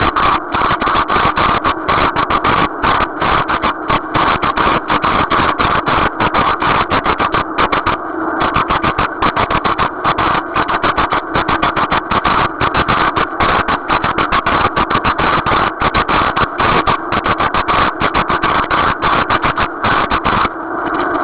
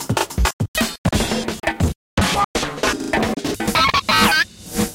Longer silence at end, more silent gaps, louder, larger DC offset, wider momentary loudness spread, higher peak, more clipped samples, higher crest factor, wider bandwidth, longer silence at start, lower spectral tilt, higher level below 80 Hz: about the same, 0 s vs 0 s; second, none vs 0.53-0.59 s, 0.68-0.74 s, 0.98-1.04 s, 1.96-2.17 s, 2.45-2.54 s; first, -14 LUFS vs -19 LUFS; neither; second, 3 LU vs 8 LU; about the same, 0 dBFS vs -2 dBFS; neither; about the same, 14 dB vs 18 dB; second, 4 kHz vs 17 kHz; about the same, 0 s vs 0 s; first, -8.5 dB/octave vs -3.5 dB/octave; about the same, -30 dBFS vs -30 dBFS